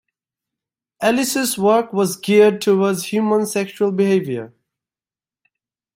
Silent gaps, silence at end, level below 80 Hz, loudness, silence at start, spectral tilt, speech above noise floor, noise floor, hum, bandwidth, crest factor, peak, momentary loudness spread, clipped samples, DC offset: none; 1.5 s; -66 dBFS; -17 LUFS; 1 s; -4.5 dB/octave; over 73 dB; under -90 dBFS; none; 16 kHz; 16 dB; -2 dBFS; 7 LU; under 0.1%; under 0.1%